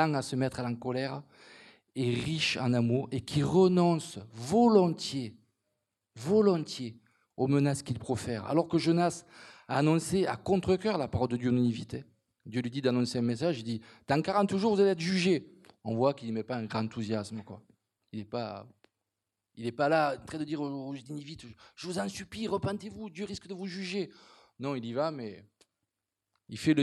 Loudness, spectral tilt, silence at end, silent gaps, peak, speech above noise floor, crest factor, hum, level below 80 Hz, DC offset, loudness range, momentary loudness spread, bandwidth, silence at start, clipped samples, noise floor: -30 LUFS; -6 dB/octave; 0 s; none; -10 dBFS; 57 dB; 22 dB; none; -66 dBFS; under 0.1%; 9 LU; 17 LU; 12.5 kHz; 0 s; under 0.1%; -87 dBFS